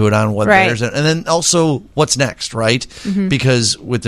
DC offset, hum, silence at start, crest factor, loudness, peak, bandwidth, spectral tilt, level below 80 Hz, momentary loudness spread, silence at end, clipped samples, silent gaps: under 0.1%; none; 0 s; 14 dB; -14 LUFS; 0 dBFS; 15 kHz; -4 dB/octave; -44 dBFS; 7 LU; 0 s; under 0.1%; none